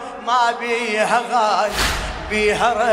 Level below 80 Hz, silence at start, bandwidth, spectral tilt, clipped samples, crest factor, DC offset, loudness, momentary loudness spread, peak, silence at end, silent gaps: -34 dBFS; 0 s; 16 kHz; -3 dB/octave; under 0.1%; 16 dB; under 0.1%; -18 LUFS; 4 LU; -2 dBFS; 0 s; none